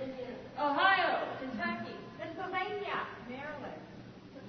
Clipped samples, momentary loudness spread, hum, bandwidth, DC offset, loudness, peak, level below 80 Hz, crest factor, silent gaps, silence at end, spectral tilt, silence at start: under 0.1%; 19 LU; none; 6.4 kHz; under 0.1%; -34 LUFS; -14 dBFS; -68 dBFS; 22 dB; none; 0 s; -1.5 dB/octave; 0 s